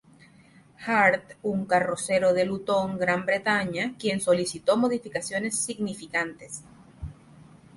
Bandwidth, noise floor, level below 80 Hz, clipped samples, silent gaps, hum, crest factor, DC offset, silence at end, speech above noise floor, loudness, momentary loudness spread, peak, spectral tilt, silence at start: 11.5 kHz; -55 dBFS; -56 dBFS; under 0.1%; none; none; 20 dB; under 0.1%; 0.35 s; 29 dB; -25 LUFS; 17 LU; -8 dBFS; -4 dB/octave; 0.8 s